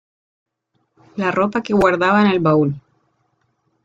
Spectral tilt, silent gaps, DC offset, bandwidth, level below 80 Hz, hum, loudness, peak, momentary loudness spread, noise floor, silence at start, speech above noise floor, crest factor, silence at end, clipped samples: -7.5 dB/octave; none; under 0.1%; 7.6 kHz; -52 dBFS; none; -16 LUFS; -2 dBFS; 10 LU; -69 dBFS; 1.15 s; 53 dB; 18 dB; 1.05 s; under 0.1%